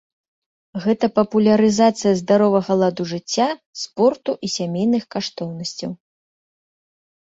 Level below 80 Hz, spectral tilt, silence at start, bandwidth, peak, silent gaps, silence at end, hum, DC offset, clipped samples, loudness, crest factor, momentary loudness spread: -60 dBFS; -5.5 dB/octave; 0.75 s; 7.8 kHz; -2 dBFS; 3.66-3.73 s; 1.25 s; none; under 0.1%; under 0.1%; -19 LUFS; 18 dB; 13 LU